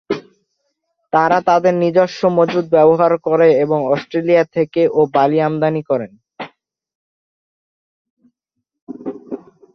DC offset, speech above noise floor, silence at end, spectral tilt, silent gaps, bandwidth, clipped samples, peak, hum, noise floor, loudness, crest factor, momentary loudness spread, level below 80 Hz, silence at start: under 0.1%; 63 dB; 0.35 s; -7.5 dB/octave; 6.95-8.17 s, 8.82-8.87 s; 6.4 kHz; under 0.1%; -2 dBFS; none; -77 dBFS; -15 LUFS; 16 dB; 19 LU; -62 dBFS; 0.1 s